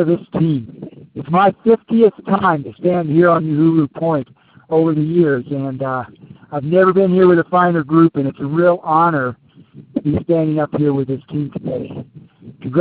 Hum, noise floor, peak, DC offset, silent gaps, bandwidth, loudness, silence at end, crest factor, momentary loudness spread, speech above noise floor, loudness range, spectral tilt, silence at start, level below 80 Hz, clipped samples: none; -42 dBFS; 0 dBFS; under 0.1%; none; 4.5 kHz; -16 LUFS; 0 s; 16 dB; 13 LU; 27 dB; 4 LU; -7.5 dB/octave; 0 s; -52 dBFS; under 0.1%